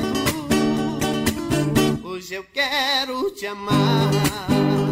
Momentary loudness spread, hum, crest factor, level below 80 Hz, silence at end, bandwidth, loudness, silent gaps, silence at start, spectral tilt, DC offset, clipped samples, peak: 9 LU; none; 14 dB; -44 dBFS; 0 s; 16 kHz; -21 LUFS; none; 0 s; -5 dB/octave; under 0.1%; under 0.1%; -6 dBFS